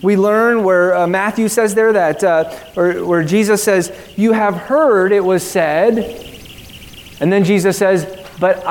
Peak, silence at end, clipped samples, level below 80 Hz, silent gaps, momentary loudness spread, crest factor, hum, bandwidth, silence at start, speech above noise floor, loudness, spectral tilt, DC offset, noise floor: 0 dBFS; 0 s; under 0.1%; -48 dBFS; none; 16 LU; 14 dB; none; 18 kHz; 0 s; 22 dB; -14 LUFS; -5.5 dB/octave; under 0.1%; -35 dBFS